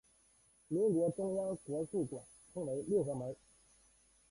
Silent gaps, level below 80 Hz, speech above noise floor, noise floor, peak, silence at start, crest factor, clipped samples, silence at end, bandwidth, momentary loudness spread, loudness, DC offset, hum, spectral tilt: none; -72 dBFS; 33 dB; -70 dBFS; -24 dBFS; 0.7 s; 16 dB; under 0.1%; 0.95 s; 11.5 kHz; 14 LU; -37 LUFS; under 0.1%; none; -8.5 dB/octave